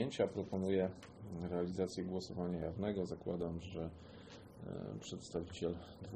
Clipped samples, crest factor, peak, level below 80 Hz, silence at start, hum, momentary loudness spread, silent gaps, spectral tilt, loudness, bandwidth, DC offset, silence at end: under 0.1%; 20 dB; -22 dBFS; -62 dBFS; 0 s; none; 13 LU; none; -6.5 dB/octave; -42 LUFS; 9.6 kHz; under 0.1%; 0 s